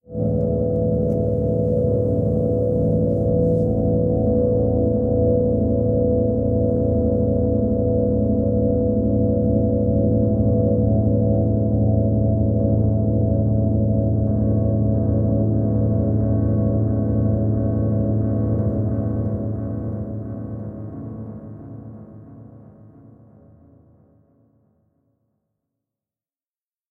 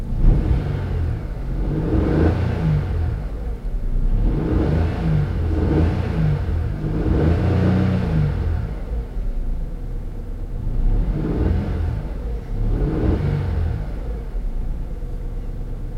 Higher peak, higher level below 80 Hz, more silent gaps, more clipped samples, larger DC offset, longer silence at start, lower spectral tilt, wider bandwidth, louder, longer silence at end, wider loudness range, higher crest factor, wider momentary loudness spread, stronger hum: about the same, -6 dBFS vs -4 dBFS; second, -32 dBFS vs -24 dBFS; neither; neither; neither; about the same, 0.1 s vs 0 s; first, -14.5 dB/octave vs -9.5 dB/octave; second, 1.6 kHz vs 5.8 kHz; first, -20 LUFS vs -23 LUFS; first, 4.3 s vs 0 s; first, 10 LU vs 5 LU; about the same, 14 dB vs 16 dB; second, 9 LU vs 12 LU; neither